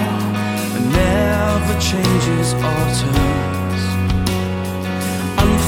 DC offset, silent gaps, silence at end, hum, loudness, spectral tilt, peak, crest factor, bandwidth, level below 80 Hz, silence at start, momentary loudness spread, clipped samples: under 0.1%; none; 0 s; none; -18 LUFS; -5.5 dB/octave; 0 dBFS; 16 dB; 17.5 kHz; -28 dBFS; 0 s; 5 LU; under 0.1%